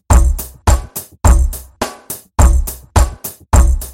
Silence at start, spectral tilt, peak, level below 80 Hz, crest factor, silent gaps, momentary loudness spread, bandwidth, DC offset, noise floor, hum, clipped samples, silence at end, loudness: 0.1 s; -5 dB/octave; 0 dBFS; -14 dBFS; 12 dB; none; 11 LU; 17 kHz; under 0.1%; -31 dBFS; none; under 0.1%; 0 s; -15 LUFS